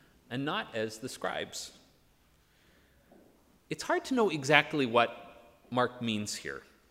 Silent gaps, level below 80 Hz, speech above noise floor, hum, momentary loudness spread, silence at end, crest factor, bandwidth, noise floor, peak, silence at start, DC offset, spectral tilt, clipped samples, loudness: none; -70 dBFS; 35 dB; none; 17 LU; 0.3 s; 28 dB; 16 kHz; -66 dBFS; -6 dBFS; 0.3 s; under 0.1%; -4 dB/octave; under 0.1%; -31 LUFS